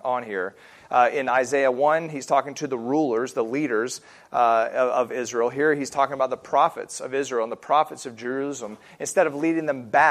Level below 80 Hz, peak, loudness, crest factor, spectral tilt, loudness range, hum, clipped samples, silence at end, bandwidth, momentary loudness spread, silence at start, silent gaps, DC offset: -72 dBFS; -4 dBFS; -24 LUFS; 18 dB; -4 dB/octave; 2 LU; none; under 0.1%; 0 s; 14.5 kHz; 10 LU; 0.05 s; none; under 0.1%